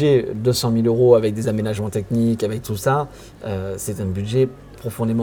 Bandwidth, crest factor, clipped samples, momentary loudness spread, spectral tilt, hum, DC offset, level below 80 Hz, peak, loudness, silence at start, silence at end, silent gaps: over 20 kHz; 18 dB; under 0.1%; 13 LU; -6.5 dB/octave; none; under 0.1%; -48 dBFS; 0 dBFS; -20 LUFS; 0 s; 0 s; none